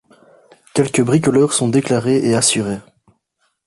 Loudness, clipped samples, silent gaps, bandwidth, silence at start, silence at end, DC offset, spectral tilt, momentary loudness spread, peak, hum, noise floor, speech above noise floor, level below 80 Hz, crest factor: -16 LUFS; under 0.1%; none; 12 kHz; 0.75 s; 0.85 s; under 0.1%; -4.5 dB/octave; 8 LU; -2 dBFS; none; -67 dBFS; 52 dB; -54 dBFS; 16 dB